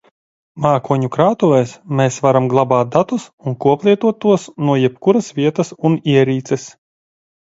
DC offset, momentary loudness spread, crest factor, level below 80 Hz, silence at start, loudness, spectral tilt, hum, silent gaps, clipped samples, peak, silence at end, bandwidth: under 0.1%; 7 LU; 16 dB; -58 dBFS; 0.55 s; -16 LUFS; -7 dB/octave; none; 3.33-3.38 s; under 0.1%; 0 dBFS; 0.85 s; 8 kHz